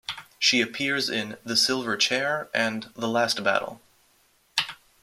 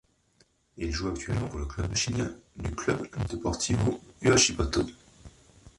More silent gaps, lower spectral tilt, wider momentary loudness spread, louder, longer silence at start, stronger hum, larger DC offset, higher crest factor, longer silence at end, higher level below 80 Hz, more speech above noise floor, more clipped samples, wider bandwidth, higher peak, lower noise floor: neither; second, -2 dB/octave vs -4 dB/octave; second, 9 LU vs 14 LU; first, -24 LUFS vs -29 LUFS; second, 0.1 s vs 0.75 s; neither; neither; about the same, 20 dB vs 20 dB; first, 0.3 s vs 0.1 s; second, -70 dBFS vs -42 dBFS; about the same, 38 dB vs 38 dB; neither; first, 16 kHz vs 11.5 kHz; first, -6 dBFS vs -10 dBFS; about the same, -64 dBFS vs -67 dBFS